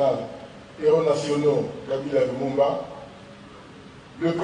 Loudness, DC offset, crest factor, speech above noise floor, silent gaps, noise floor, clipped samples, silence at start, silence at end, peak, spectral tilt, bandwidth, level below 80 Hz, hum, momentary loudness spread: -24 LUFS; under 0.1%; 16 dB; 22 dB; none; -45 dBFS; under 0.1%; 0 s; 0 s; -8 dBFS; -6.5 dB/octave; 10.5 kHz; -58 dBFS; none; 23 LU